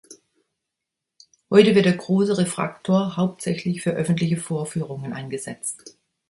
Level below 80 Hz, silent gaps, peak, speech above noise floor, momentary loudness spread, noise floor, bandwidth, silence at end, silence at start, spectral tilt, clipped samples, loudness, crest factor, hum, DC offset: -62 dBFS; none; 0 dBFS; 63 dB; 14 LU; -84 dBFS; 11.5 kHz; 0.4 s; 0.1 s; -6 dB/octave; under 0.1%; -22 LUFS; 22 dB; none; under 0.1%